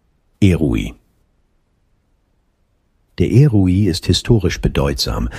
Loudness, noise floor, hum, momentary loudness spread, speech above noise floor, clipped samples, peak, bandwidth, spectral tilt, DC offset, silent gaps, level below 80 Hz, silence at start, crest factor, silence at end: -15 LUFS; -62 dBFS; none; 7 LU; 47 dB; under 0.1%; 0 dBFS; 15 kHz; -6.5 dB/octave; under 0.1%; none; -30 dBFS; 0.4 s; 16 dB; 0 s